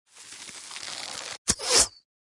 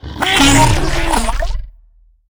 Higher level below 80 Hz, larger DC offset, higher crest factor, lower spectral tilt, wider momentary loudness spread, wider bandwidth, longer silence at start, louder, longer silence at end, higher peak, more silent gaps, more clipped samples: second, -52 dBFS vs -20 dBFS; neither; first, 26 dB vs 14 dB; second, 0 dB/octave vs -3.5 dB/octave; first, 20 LU vs 15 LU; second, 11.5 kHz vs over 20 kHz; first, 0.15 s vs 0 s; second, -25 LUFS vs -13 LUFS; second, 0.45 s vs 0.6 s; second, -4 dBFS vs 0 dBFS; first, 1.38-1.45 s vs none; neither